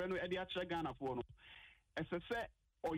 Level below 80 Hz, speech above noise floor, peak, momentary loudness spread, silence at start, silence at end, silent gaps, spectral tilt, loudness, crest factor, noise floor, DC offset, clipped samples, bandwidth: -66 dBFS; 19 dB; -30 dBFS; 15 LU; 0 s; 0 s; none; -6 dB/octave; -44 LUFS; 14 dB; -62 dBFS; under 0.1%; under 0.1%; 16 kHz